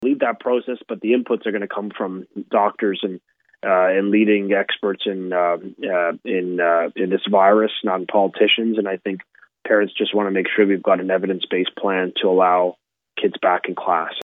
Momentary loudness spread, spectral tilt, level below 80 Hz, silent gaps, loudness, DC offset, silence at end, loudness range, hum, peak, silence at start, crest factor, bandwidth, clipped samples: 10 LU; -8 dB/octave; -78 dBFS; none; -19 LUFS; under 0.1%; 0 s; 3 LU; none; -4 dBFS; 0 s; 16 dB; 4 kHz; under 0.1%